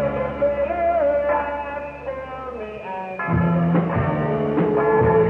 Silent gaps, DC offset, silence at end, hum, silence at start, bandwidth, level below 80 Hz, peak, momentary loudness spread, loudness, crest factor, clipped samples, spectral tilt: none; under 0.1%; 0 s; none; 0 s; 4 kHz; -42 dBFS; -6 dBFS; 12 LU; -22 LUFS; 16 dB; under 0.1%; -10 dB/octave